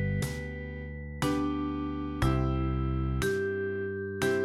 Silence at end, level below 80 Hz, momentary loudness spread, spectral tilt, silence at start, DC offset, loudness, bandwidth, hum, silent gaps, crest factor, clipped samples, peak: 0 s; -38 dBFS; 9 LU; -6.5 dB/octave; 0 s; under 0.1%; -32 LUFS; 15.5 kHz; none; none; 18 dB; under 0.1%; -14 dBFS